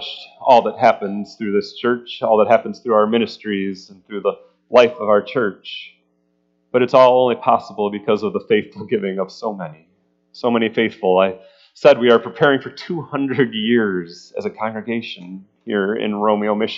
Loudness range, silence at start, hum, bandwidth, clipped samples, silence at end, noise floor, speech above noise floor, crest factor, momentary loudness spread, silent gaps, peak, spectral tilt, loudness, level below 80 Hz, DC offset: 4 LU; 0 s; none; 7.4 kHz; under 0.1%; 0 s; -65 dBFS; 47 dB; 18 dB; 14 LU; none; 0 dBFS; -6.5 dB/octave; -18 LUFS; -68 dBFS; under 0.1%